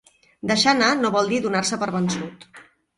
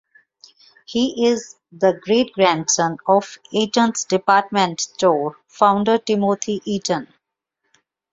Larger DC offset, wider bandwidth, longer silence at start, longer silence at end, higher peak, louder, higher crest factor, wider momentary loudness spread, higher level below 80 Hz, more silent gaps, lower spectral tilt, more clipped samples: neither; first, 11.5 kHz vs 7.8 kHz; second, 0.45 s vs 0.9 s; second, 0.35 s vs 1.05 s; about the same, -2 dBFS vs 0 dBFS; about the same, -21 LUFS vs -19 LUFS; about the same, 20 dB vs 18 dB; first, 12 LU vs 8 LU; about the same, -60 dBFS vs -62 dBFS; neither; about the same, -3.5 dB/octave vs -3.5 dB/octave; neither